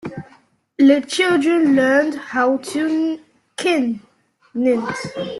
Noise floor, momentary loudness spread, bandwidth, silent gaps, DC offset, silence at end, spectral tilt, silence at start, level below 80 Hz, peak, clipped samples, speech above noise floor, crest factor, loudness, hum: -54 dBFS; 17 LU; 12 kHz; none; under 0.1%; 0 s; -4.5 dB/octave; 0.05 s; -62 dBFS; -2 dBFS; under 0.1%; 37 dB; 16 dB; -18 LUFS; none